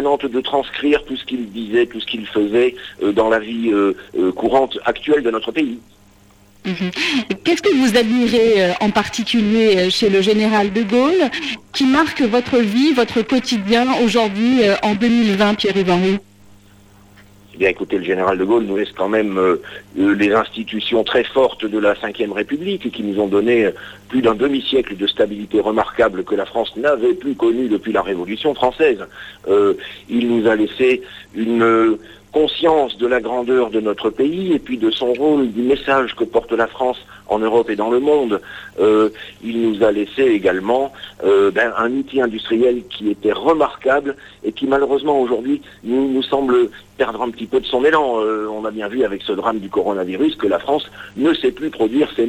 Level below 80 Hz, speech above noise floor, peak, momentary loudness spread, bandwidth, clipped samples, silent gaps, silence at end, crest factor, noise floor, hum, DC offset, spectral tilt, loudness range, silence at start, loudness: -48 dBFS; 32 dB; -4 dBFS; 8 LU; 14 kHz; under 0.1%; none; 0 s; 12 dB; -49 dBFS; none; under 0.1%; -5.5 dB/octave; 4 LU; 0 s; -17 LUFS